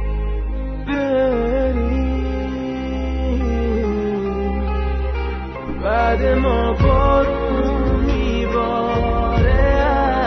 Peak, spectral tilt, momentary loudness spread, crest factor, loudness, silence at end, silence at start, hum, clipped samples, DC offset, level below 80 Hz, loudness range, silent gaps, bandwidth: -4 dBFS; -8.5 dB/octave; 8 LU; 14 dB; -19 LUFS; 0 s; 0 s; none; under 0.1%; under 0.1%; -22 dBFS; 4 LU; none; 6.2 kHz